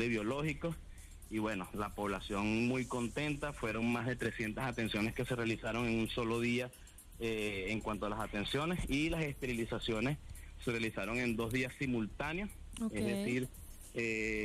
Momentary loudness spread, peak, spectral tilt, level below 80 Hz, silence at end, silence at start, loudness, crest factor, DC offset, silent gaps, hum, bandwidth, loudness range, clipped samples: 8 LU; -24 dBFS; -5.5 dB/octave; -52 dBFS; 0 s; 0 s; -37 LUFS; 14 dB; under 0.1%; none; none; 15.5 kHz; 1 LU; under 0.1%